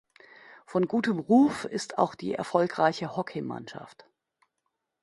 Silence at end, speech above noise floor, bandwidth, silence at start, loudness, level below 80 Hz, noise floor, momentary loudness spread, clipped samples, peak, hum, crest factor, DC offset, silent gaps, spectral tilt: 1.15 s; 54 dB; 11.5 kHz; 0.5 s; -27 LUFS; -70 dBFS; -81 dBFS; 15 LU; under 0.1%; -8 dBFS; none; 22 dB; under 0.1%; none; -6 dB/octave